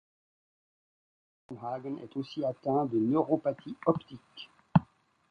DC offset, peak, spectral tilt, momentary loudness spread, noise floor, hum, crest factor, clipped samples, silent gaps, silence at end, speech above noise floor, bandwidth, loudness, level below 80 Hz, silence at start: under 0.1%; -8 dBFS; -9.5 dB/octave; 20 LU; -58 dBFS; none; 24 dB; under 0.1%; none; 0.45 s; 27 dB; 6.4 kHz; -31 LUFS; -62 dBFS; 1.5 s